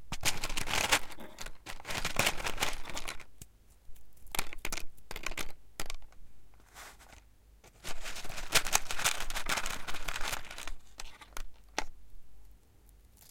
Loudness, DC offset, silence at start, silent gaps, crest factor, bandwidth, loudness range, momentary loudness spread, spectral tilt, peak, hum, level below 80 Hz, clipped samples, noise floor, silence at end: -35 LUFS; under 0.1%; 0 s; none; 26 dB; 17 kHz; 11 LU; 20 LU; -1 dB/octave; -6 dBFS; none; -44 dBFS; under 0.1%; -59 dBFS; 0.05 s